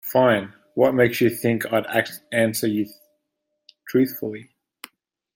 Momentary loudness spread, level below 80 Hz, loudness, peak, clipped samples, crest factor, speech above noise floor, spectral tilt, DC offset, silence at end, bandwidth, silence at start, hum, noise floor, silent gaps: 13 LU; -64 dBFS; -22 LUFS; -4 dBFS; under 0.1%; 20 dB; 57 dB; -5.5 dB/octave; under 0.1%; 0.9 s; 16.5 kHz; 0.05 s; none; -78 dBFS; none